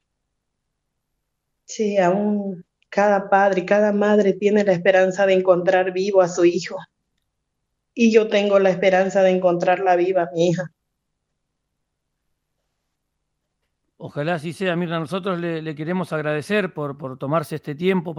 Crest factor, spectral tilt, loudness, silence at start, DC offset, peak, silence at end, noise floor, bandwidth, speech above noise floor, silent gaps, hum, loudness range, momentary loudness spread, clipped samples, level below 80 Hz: 18 dB; -6 dB/octave; -19 LUFS; 1.7 s; under 0.1%; -2 dBFS; 0 s; -77 dBFS; 12.5 kHz; 58 dB; none; none; 10 LU; 11 LU; under 0.1%; -70 dBFS